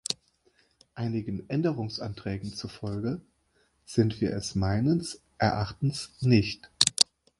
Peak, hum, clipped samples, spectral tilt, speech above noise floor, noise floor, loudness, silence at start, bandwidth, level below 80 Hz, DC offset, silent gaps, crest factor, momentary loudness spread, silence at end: -2 dBFS; none; under 0.1%; -4.5 dB/octave; 41 dB; -69 dBFS; -28 LUFS; 0.1 s; 11.5 kHz; -50 dBFS; under 0.1%; none; 28 dB; 11 LU; 0.35 s